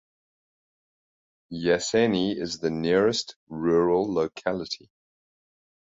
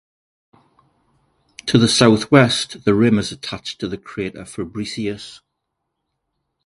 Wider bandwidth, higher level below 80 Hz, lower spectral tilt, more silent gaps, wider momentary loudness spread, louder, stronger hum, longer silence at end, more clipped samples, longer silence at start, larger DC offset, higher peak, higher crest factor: second, 8 kHz vs 11.5 kHz; second, -60 dBFS vs -50 dBFS; about the same, -5 dB/octave vs -5 dB/octave; first, 3.36-3.47 s vs none; second, 11 LU vs 16 LU; second, -25 LUFS vs -18 LUFS; neither; second, 1.1 s vs 1.3 s; neither; second, 1.5 s vs 1.65 s; neither; second, -8 dBFS vs 0 dBFS; about the same, 18 dB vs 20 dB